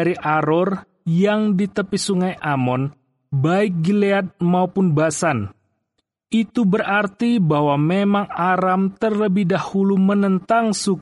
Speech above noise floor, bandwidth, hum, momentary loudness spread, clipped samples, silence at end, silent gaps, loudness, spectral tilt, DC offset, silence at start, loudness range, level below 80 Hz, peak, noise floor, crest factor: 56 dB; 11.5 kHz; none; 5 LU; under 0.1%; 0 s; none; -19 LUFS; -6.5 dB/octave; under 0.1%; 0 s; 2 LU; -60 dBFS; -4 dBFS; -74 dBFS; 14 dB